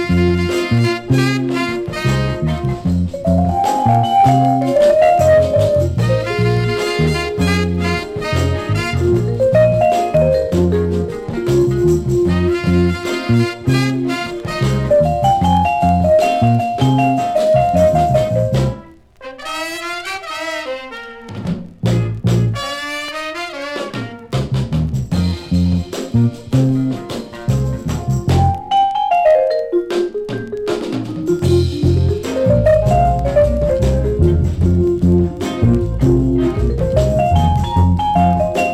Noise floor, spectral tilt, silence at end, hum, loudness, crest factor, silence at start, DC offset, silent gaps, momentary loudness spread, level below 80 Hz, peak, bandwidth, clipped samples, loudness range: -37 dBFS; -7 dB/octave; 0 s; none; -16 LUFS; 14 dB; 0 s; under 0.1%; none; 10 LU; -28 dBFS; -2 dBFS; 14 kHz; under 0.1%; 7 LU